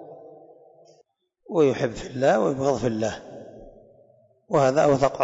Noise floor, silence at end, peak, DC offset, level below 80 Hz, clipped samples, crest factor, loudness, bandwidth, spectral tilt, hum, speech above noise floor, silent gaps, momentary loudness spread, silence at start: -64 dBFS; 0 s; -8 dBFS; under 0.1%; -54 dBFS; under 0.1%; 16 dB; -23 LUFS; 8 kHz; -6 dB/octave; none; 43 dB; none; 23 LU; 0 s